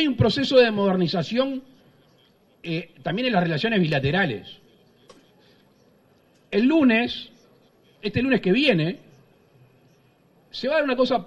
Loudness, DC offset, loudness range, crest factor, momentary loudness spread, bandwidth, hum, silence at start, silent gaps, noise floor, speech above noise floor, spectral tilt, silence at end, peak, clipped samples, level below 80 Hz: -22 LUFS; under 0.1%; 3 LU; 20 dB; 16 LU; 11 kHz; none; 0 s; none; -59 dBFS; 38 dB; -7 dB/octave; 0 s; -4 dBFS; under 0.1%; -54 dBFS